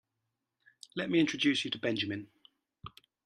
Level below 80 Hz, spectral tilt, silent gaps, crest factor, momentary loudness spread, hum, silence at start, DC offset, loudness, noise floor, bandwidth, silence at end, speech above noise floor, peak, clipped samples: -72 dBFS; -4.5 dB/octave; none; 22 dB; 23 LU; none; 0.95 s; under 0.1%; -32 LUFS; -85 dBFS; 10.5 kHz; 0.35 s; 54 dB; -14 dBFS; under 0.1%